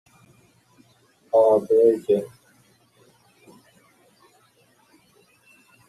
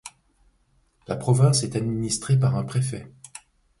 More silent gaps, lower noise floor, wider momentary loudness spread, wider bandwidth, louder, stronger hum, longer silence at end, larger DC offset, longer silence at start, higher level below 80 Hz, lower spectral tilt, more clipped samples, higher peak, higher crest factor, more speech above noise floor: neither; second, -60 dBFS vs -65 dBFS; second, 7 LU vs 24 LU; first, 13 kHz vs 11.5 kHz; first, -20 LUFS vs -23 LUFS; neither; first, 3.6 s vs 0.4 s; neither; first, 1.35 s vs 0.05 s; second, -72 dBFS vs -54 dBFS; first, -7.5 dB/octave vs -5.5 dB/octave; neither; about the same, -6 dBFS vs -8 dBFS; about the same, 20 dB vs 18 dB; about the same, 42 dB vs 43 dB